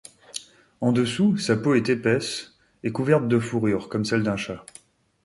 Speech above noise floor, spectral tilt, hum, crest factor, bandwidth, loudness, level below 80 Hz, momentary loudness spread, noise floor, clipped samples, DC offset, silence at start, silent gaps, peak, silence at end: 30 dB; -6 dB/octave; none; 18 dB; 11.5 kHz; -24 LUFS; -58 dBFS; 15 LU; -52 dBFS; under 0.1%; under 0.1%; 0.35 s; none; -6 dBFS; 0.65 s